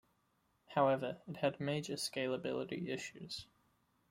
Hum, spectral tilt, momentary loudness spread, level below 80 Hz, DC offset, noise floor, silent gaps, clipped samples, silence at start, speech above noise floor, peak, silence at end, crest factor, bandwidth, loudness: none; -5 dB/octave; 12 LU; -76 dBFS; under 0.1%; -78 dBFS; none; under 0.1%; 0.7 s; 40 dB; -20 dBFS; 0.65 s; 20 dB; 16 kHz; -39 LUFS